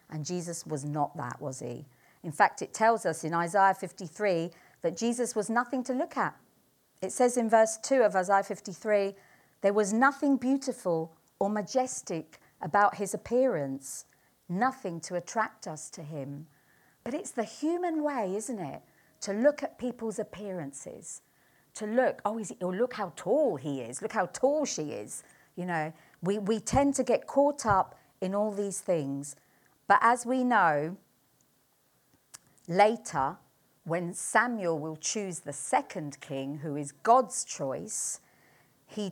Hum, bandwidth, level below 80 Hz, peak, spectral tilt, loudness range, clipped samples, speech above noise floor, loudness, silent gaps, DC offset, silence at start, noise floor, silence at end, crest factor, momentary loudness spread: none; 19 kHz; -62 dBFS; -8 dBFS; -4.5 dB/octave; 6 LU; under 0.1%; 40 dB; -30 LUFS; none; under 0.1%; 0.1 s; -69 dBFS; 0 s; 22 dB; 15 LU